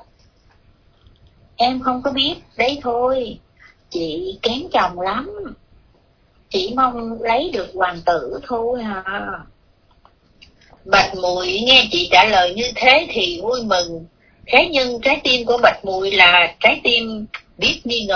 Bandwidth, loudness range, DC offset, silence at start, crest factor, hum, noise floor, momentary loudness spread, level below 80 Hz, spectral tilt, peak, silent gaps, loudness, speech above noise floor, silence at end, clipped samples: 5.4 kHz; 9 LU; under 0.1%; 1.6 s; 18 dB; none; -56 dBFS; 14 LU; -46 dBFS; -3 dB/octave; 0 dBFS; none; -16 LUFS; 38 dB; 0 s; under 0.1%